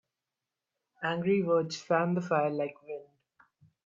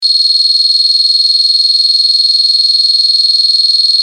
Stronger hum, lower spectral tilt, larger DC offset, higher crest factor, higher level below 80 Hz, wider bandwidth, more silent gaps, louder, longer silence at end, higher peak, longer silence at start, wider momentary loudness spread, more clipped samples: neither; first, -6.5 dB/octave vs 9 dB/octave; neither; first, 20 dB vs 10 dB; first, -76 dBFS vs under -90 dBFS; second, 7.6 kHz vs 13.5 kHz; neither; second, -30 LUFS vs -6 LUFS; first, 0.8 s vs 0 s; second, -12 dBFS vs 0 dBFS; first, 1 s vs 0 s; first, 15 LU vs 0 LU; neither